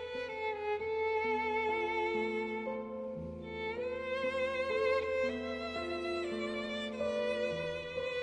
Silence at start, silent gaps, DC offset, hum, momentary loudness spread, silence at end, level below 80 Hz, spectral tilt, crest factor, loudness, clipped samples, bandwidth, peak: 0 s; none; under 0.1%; none; 7 LU; 0 s; -62 dBFS; -5 dB/octave; 14 dB; -36 LUFS; under 0.1%; 10 kHz; -22 dBFS